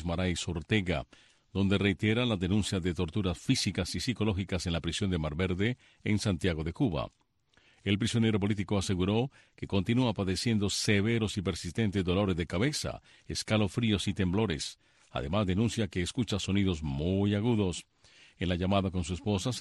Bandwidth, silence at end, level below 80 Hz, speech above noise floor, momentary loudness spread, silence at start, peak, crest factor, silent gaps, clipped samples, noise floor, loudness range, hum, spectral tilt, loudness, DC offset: 12.5 kHz; 0 s; -50 dBFS; 37 dB; 8 LU; 0 s; -12 dBFS; 18 dB; none; under 0.1%; -67 dBFS; 2 LU; none; -5.5 dB/octave; -31 LUFS; under 0.1%